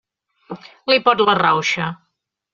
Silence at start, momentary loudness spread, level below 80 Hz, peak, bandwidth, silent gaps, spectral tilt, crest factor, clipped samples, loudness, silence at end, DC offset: 0.5 s; 21 LU; -62 dBFS; 0 dBFS; 7.6 kHz; none; -1.5 dB/octave; 18 dB; under 0.1%; -16 LUFS; 0.6 s; under 0.1%